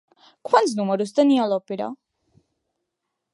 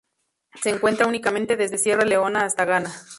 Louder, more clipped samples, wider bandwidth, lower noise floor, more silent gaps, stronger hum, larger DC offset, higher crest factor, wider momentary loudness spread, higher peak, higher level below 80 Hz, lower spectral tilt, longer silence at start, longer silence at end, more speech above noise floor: about the same, -21 LUFS vs -21 LUFS; neither; about the same, 11.5 kHz vs 11.5 kHz; first, -81 dBFS vs -72 dBFS; neither; neither; neither; about the same, 20 dB vs 18 dB; first, 13 LU vs 5 LU; about the same, -2 dBFS vs -4 dBFS; second, -78 dBFS vs -62 dBFS; first, -5.5 dB/octave vs -3 dB/octave; about the same, 0.45 s vs 0.55 s; first, 1.4 s vs 0 s; first, 60 dB vs 51 dB